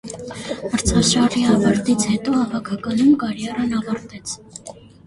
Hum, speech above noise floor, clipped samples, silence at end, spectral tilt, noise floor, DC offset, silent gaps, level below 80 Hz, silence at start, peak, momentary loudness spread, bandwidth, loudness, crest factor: none; 21 dB; under 0.1%; 0.3 s; -4.5 dB/octave; -40 dBFS; under 0.1%; none; -40 dBFS; 0.05 s; -2 dBFS; 15 LU; 11.5 kHz; -19 LUFS; 18 dB